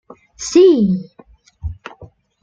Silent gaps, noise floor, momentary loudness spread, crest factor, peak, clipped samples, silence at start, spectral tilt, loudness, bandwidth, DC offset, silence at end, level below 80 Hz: none; -48 dBFS; 23 LU; 16 dB; -2 dBFS; under 0.1%; 0.4 s; -6 dB/octave; -13 LUFS; 7.8 kHz; under 0.1%; 0.35 s; -40 dBFS